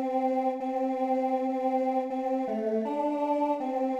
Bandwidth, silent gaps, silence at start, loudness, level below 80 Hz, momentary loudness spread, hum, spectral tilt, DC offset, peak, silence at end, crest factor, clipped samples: 8.2 kHz; none; 0 s; -29 LUFS; -76 dBFS; 2 LU; none; -7 dB/octave; under 0.1%; -16 dBFS; 0 s; 12 dB; under 0.1%